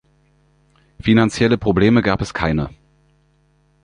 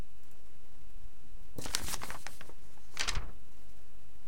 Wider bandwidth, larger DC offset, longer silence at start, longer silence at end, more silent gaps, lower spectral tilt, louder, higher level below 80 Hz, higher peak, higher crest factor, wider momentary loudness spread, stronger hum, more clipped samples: second, 10.5 kHz vs 17 kHz; second, under 0.1% vs 4%; first, 1 s vs 0 s; first, 1.15 s vs 0 s; neither; first, -6.5 dB/octave vs -2 dB/octave; first, -17 LUFS vs -39 LUFS; first, -38 dBFS vs -48 dBFS; first, -2 dBFS vs -8 dBFS; second, 18 dB vs 36 dB; second, 9 LU vs 26 LU; first, 50 Hz at -45 dBFS vs none; neither